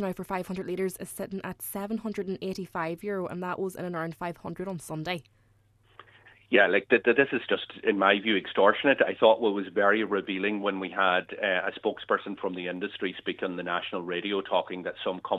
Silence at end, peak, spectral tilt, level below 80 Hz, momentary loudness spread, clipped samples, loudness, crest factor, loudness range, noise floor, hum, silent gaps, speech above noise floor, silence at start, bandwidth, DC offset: 0 s; -6 dBFS; -5 dB/octave; -66 dBFS; 13 LU; under 0.1%; -28 LUFS; 22 dB; 10 LU; -64 dBFS; none; none; 36 dB; 0 s; 14 kHz; under 0.1%